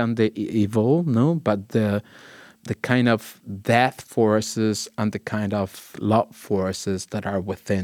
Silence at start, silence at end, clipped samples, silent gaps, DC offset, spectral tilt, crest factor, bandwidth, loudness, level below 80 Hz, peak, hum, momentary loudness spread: 0 s; 0 s; under 0.1%; none; under 0.1%; -6 dB/octave; 20 dB; 17.5 kHz; -23 LUFS; -64 dBFS; -2 dBFS; none; 9 LU